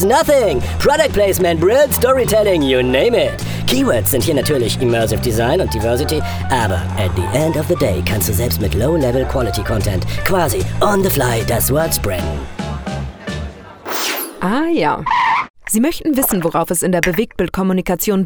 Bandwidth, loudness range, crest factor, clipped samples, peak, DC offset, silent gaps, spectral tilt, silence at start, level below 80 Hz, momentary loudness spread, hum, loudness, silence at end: over 20 kHz; 5 LU; 16 dB; under 0.1%; 0 dBFS; under 0.1%; 15.50-15.54 s; -5 dB/octave; 0 s; -30 dBFS; 7 LU; none; -16 LUFS; 0 s